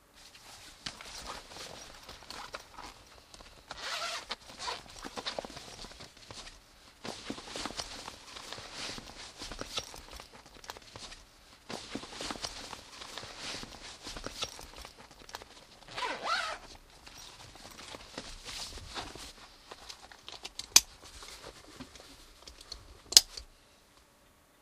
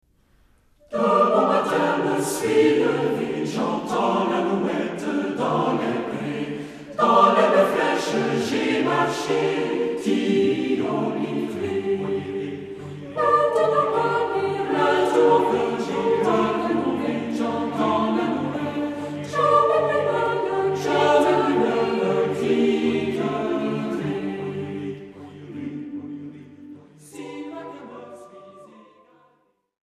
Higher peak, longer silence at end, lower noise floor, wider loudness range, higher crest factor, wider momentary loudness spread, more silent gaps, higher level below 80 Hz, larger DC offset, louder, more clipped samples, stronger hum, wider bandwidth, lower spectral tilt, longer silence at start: first, 0 dBFS vs -4 dBFS; second, 0.3 s vs 1.3 s; about the same, -63 dBFS vs -65 dBFS; about the same, 14 LU vs 13 LU; first, 40 dB vs 20 dB; about the same, 16 LU vs 16 LU; neither; about the same, -58 dBFS vs -62 dBFS; neither; second, -34 LUFS vs -22 LUFS; neither; neither; first, 15.5 kHz vs 14 kHz; second, 0 dB/octave vs -5.5 dB/octave; second, 0.15 s vs 0.9 s